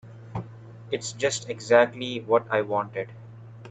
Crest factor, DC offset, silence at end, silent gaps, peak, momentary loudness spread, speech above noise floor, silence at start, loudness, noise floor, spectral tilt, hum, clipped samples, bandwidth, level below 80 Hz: 22 dB; under 0.1%; 0 s; none; -4 dBFS; 24 LU; 19 dB; 0.05 s; -25 LUFS; -44 dBFS; -4 dB/octave; none; under 0.1%; 9.2 kHz; -66 dBFS